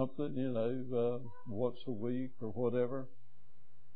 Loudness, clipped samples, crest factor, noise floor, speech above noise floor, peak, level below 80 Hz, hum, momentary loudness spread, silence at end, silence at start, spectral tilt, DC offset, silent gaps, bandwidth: -38 LUFS; under 0.1%; 16 dB; -66 dBFS; 29 dB; -20 dBFS; -76 dBFS; none; 9 LU; 0.05 s; 0 s; -8 dB/octave; 1%; none; 4.8 kHz